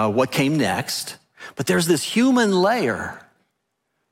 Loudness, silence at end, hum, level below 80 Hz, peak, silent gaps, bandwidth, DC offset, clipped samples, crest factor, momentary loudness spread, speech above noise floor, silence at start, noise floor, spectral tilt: -20 LUFS; 0.95 s; none; -62 dBFS; -6 dBFS; none; 16.5 kHz; under 0.1%; under 0.1%; 14 dB; 16 LU; 55 dB; 0 s; -75 dBFS; -4.5 dB/octave